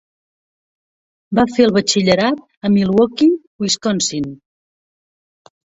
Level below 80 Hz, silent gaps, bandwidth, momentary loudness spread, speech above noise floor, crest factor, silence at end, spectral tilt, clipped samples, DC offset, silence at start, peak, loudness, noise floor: -52 dBFS; 2.57-2.61 s, 3.47-3.59 s; 8 kHz; 8 LU; over 75 dB; 18 dB; 1.45 s; -4.5 dB/octave; under 0.1%; under 0.1%; 1.3 s; 0 dBFS; -16 LUFS; under -90 dBFS